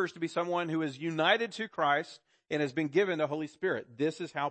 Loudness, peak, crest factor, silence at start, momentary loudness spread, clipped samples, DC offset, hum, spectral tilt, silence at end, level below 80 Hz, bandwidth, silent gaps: -31 LUFS; -12 dBFS; 20 dB; 0 s; 7 LU; under 0.1%; under 0.1%; none; -5.5 dB/octave; 0 s; -80 dBFS; 8.8 kHz; none